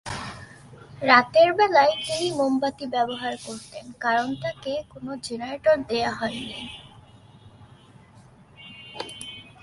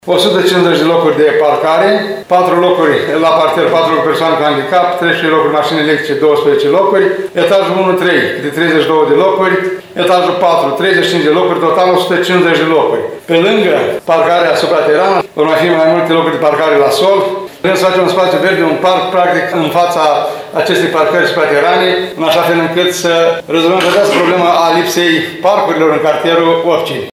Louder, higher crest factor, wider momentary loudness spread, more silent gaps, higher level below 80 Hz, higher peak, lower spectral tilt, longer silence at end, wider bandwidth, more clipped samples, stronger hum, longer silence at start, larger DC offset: second, -23 LUFS vs -10 LUFS; first, 24 dB vs 10 dB; first, 20 LU vs 3 LU; neither; about the same, -58 dBFS vs -58 dBFS; about the same, -2 dBFS vs 0 dBFS; about the same, -4 dB/octave vs -4.5 dB/octave; first, 0.2 s vs 0 s; second, 11.5 kHz vs 16.5 kHz; neither; neither; about the same, 0.05 s vs 0.05 s; neither